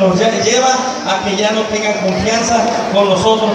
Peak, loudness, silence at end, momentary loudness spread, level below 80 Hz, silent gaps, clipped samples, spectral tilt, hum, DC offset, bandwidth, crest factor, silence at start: 0 dBFS; -13 LUFS; 0 s; 4 LU; -44 dBFS; none; under 0.1%; -3.5 dB/octave; none; under 0.1%; 11.5 kHz; 12 dB; 0 s